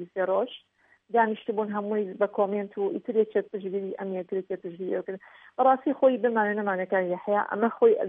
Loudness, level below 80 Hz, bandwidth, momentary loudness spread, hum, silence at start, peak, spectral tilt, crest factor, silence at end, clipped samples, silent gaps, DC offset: -27 LUFS; -84 dBFS; 3.8 kHz; 11 LU; none; 0 s; -8 dBFS; -9.5 dB/octave; 18 dB; 0 s; under 0.1%; none; under 0.1%